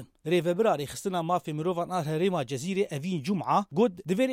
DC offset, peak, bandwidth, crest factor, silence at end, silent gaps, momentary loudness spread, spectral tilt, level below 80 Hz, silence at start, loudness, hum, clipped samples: under 0.1%; -12 dBFS; 16.5 kHz; 16 dB; 0 s; none; 5 LU; -6 dB/octave; -68 dBFS; 0 s; -28 LUFS; none; under 0.1%